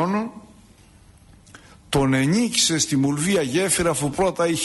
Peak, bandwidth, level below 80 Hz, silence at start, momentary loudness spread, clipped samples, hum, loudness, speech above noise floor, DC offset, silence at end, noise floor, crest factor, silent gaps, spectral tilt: -6 dBFS; 12 kHz; -46 dBFS; 0 s; 6 LU; under 0.1%; none; -20 LUFS; 30 dB; under 0.1%; 0 s; -50 dBFS; 16 dB; none; -4 dB/octave